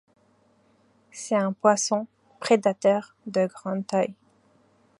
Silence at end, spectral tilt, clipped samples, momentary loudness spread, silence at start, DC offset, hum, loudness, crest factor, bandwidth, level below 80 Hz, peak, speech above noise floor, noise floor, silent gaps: 0.85 s; -4.5 dB/octave; under 0.1%; 13 LU; 1.15 s; under 0.1%; none; -25 LUFS; 22 dB; 11.5 kHz; -78 dBFS; -4 dBFS; 39 dB; -63 dBFS; none